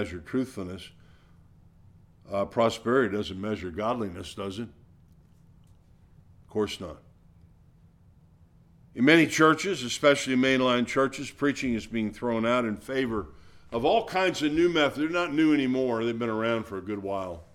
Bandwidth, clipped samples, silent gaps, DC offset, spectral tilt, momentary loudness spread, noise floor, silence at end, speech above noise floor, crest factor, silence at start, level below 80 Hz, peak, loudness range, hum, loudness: 15 kHz; under 0.1%; none; under 0.1%; -5 dB/octave; 14 LU; -57 dBFS; 0.1 s; 31 dB; 22 dB; 0 s; -56 dBFS; -6 dBFS; 15 LU; none; -26 LUFS